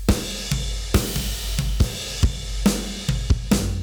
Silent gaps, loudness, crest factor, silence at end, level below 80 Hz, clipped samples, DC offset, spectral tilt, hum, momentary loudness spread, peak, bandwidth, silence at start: none; -24 LUFS; 12 dB; 0 s; -26 dBFS; under 0.1%; under 0.1%; -4.5 dB/octave; none; 4 LU; -10 dBFS; over 20 kHz; 0 s